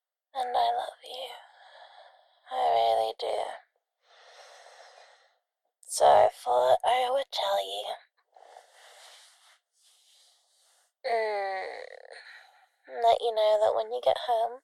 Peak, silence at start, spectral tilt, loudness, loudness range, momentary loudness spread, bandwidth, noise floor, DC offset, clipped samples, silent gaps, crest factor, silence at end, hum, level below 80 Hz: -8 dBFS; 0.35 s; -1 dB/octave; -27 LUFS; 11 LU; 19 LU; 14 kHz; -79 dBFS; under 0.1%; under 0.1%; none; 22 dB; 0.05 s; none; -72 dBFS